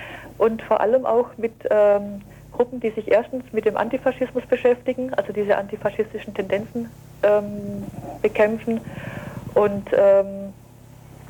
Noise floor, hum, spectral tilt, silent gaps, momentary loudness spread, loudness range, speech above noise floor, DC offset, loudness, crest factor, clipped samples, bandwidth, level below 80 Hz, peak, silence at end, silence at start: -45 dBFS; none; -7 dB/octave; none; 15 LU; 3 LU; 24 dB; under 0.1%; -22 LUFS; 14 dB; under 0.1%; 19 kHz; -52 dBFS; -8 dBFS; 0 s; 0 s